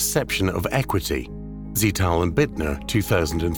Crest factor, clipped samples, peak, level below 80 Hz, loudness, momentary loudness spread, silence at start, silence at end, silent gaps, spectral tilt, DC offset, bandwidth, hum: 18 dB; under 0.1%; -6 dBFS; -36 dBFS; -23 LUFS; 7 LU; 0 s; 0 s; none; -4.5 dB/octave; 0.3%; 19 kHz; none